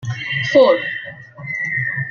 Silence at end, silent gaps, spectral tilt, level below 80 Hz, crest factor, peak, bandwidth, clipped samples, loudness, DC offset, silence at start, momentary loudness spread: 0 s; none; -5.5 dB/octave; -60 dBFS; 16 dB; -2 dBFS; 7 kHz; under 0.1%; -17 LUFS; under 0.1%; 0 s; 17 LU